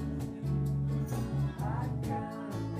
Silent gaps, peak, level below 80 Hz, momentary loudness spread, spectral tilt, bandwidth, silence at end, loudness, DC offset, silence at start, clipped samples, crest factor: none; -22 dBFS; -46 dBFS; 5 LU; -8 dB/octave; 15.5 kHz; 0 s; -34 LUFS; under 0.1%; 0 s; under 0.1%; 12 dB